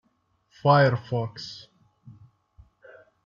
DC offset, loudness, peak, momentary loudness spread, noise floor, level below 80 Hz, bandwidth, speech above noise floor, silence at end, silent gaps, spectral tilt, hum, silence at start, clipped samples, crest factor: under 0.1%; -23 LUFS; -6 dBFS; 20 LU; -69 dBFS; -64 dBFS; 7.2 kHz; 47 dB; 1.65 s; none; -7.5 dB/octave; none; 0.65 s; under 0.1%; 20 dB